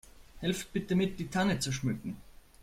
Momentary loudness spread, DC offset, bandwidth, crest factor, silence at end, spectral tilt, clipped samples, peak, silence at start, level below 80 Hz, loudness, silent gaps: 9 LU; under 0.1%; 16 kHz; 16 dB; 0.3 s; -5 dB/octave; under 0.1%; -16 dBFS; 0.2 s; -54 dBFS; -33 LUFS; none